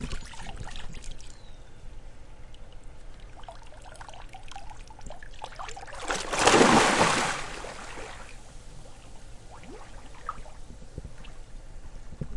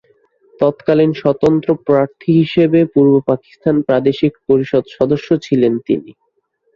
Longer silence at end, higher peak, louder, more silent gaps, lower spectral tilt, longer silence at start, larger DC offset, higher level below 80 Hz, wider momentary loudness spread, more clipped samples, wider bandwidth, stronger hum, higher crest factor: second, 0 s vs 0.65 s; about the same, -2 dBFS vs -2 dBFS; second, -25 LUFS vs -14 LUFS; neither; second, -3 dB/octave vs -8.5 dB/octave; second, 0 s vs 0.6 s; neither; first, -44 dBFS vs -52 dBFS; first, 29 LU vs 6 LU; neither; first, 11.5 kHz vs 7 kHz; neither; first, 28 dB vs 14 dB